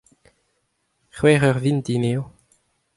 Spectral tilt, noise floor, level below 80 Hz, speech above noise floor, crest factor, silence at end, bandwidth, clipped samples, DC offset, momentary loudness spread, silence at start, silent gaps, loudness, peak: -6.5 dB/octave; -71 dBFS; -54 dBFS; 52 dB; 20 dB; 0.7 s; 11.5 kHz; under 0.1%; under 0.1%; 11 LU; 1.15 s; none; -20 LUFS; -2 dBFS